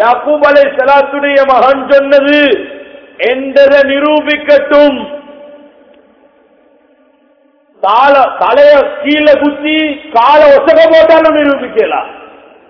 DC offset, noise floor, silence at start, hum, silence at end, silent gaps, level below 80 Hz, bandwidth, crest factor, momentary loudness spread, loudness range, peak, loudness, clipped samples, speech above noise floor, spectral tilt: under 0.1%; -49 dBFS; 0 s; none; 0.45 s; none; -46 dBFS; 5.4 kHz; 8 dB; 9 LU; 7 LU; 0 dBFS; -7 LUFS; 5%; 42 dB; -5 dB/octave